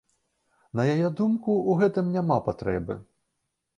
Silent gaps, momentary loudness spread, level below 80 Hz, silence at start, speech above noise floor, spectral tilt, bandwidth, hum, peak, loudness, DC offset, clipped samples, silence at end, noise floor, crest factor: none; 10 LU; -54 dBFS; 0.75 s; 55 dB; -9 dB/octave; 9.4 kHz; none; -10 dBFS; -25 LUFS; under 0.1%; under 0.1%; 0.75 s; -79 dBFS; 18 dB